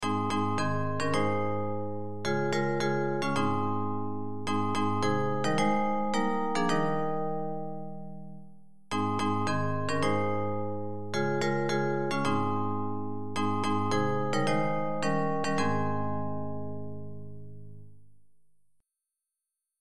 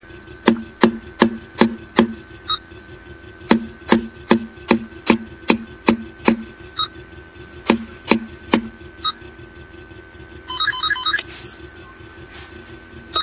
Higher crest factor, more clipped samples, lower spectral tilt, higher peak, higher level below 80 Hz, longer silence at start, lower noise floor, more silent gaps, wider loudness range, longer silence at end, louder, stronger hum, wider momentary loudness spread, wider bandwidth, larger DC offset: second, 16 dB vs 22 dB; neither; second, -6 dB/octave vs -9.5 dB/octave; second, -14 dBFS vs 0 dBFS; second, -64 dBFS vs -46 dBFS; about the same, 0 s vs 0.1 s; first, -87 dBFS vs -40 dBFS; neither; about the same, 4 LU vs 4 LU; about the same, 0 s vs 0 s; second, -30 LUFS vs -20 LUFS; neither; second, 10 LU vs 21 LU; first, 13 kHz vs 4 kHz; first, 2% vs under 0.1%